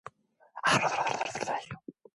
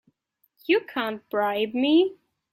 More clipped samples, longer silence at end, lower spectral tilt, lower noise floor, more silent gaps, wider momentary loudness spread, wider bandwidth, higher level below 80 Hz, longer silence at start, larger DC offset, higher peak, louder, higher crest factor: neither; second, 0.25 s vs 0.4 s; second, -3 dB/octave vs -6 dB/octave; second, -60 dBFS vs -70 dBFS; neither; first, 20 LU vs 9 LU; second, 11.5 kHz vs 15 kHz; about the same, -68 dBFS vs -72 dBFS; second, 0.05 s vs 0.7 s; neither; second, -12 dBFS vs -8 dBFS; second, -30 LUFS vs -24 LUFS; about the same, 20 dB vs 16 dB